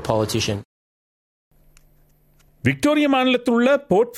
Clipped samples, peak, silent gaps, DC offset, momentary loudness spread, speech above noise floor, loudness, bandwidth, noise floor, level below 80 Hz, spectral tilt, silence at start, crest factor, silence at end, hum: under 0.1%; -2 dBFS; 0.65-1.51 s; under 0.1%; 7 LU; 38 dB; -19 LUFS; 15.5 kHz; -56 dBFS; -52 dBFS; -5 dB/octave; 0 s; 18 dB; 0 s; none